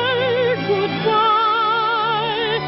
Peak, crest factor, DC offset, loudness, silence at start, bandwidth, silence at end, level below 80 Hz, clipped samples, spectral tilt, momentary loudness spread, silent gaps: -6 dBFS; 12 dB; under 0.1%; -18 LUFS; 0 s; 5.8 kHz; 0 s; -56 dBFS; under 0.1%; -8.5 dB/octave; 4 LU; none